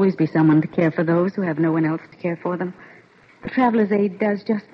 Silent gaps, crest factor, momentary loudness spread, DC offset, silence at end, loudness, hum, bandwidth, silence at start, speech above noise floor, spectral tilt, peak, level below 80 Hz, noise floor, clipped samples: none; 12 dB; 10 LU; under 0.1%; 0.15 s; -20 LUFS; none; 5.8 kHz; 0 s; 30 dB; -10 dB/octave; -8 dBFS; -62 dBFS; -50 dBFS; under 0.1%